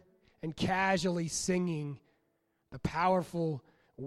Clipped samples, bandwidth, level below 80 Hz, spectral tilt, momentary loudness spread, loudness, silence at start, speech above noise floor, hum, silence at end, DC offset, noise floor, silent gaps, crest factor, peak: under 0.1%; 13 kHz; -60 dBFS; -5 dB/octave; 14 LU; -32 LUFS; 0.45 s; 45 dB; none; 0 s; under 0.1%; -77 dBFS; none; 20 dB; -14 dBFS